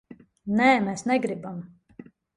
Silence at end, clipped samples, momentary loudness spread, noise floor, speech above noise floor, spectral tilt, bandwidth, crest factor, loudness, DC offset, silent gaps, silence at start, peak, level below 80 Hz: 0.35 s; under 0.1%; 19 LU; -49 dBFS; 25 dB; -5.5 dB/octave; 11 kHz; 20 dB; -24 LUFS; under 0.1%; none; 0.1 s; -6 dBFS; -64 dBFS